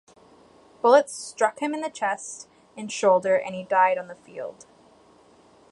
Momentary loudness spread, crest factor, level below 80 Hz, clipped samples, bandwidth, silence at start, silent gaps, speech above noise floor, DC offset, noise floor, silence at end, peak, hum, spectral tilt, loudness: 20 LU; 22 dB; -74 dBFS; under 0.1%; 11.5 kHz; 0.85 s; none; 32 dB; under 0.1%; -55 dBFS; 1.2 s; -4 dBFS; none; -3.5 dB/octave; -23 LUFS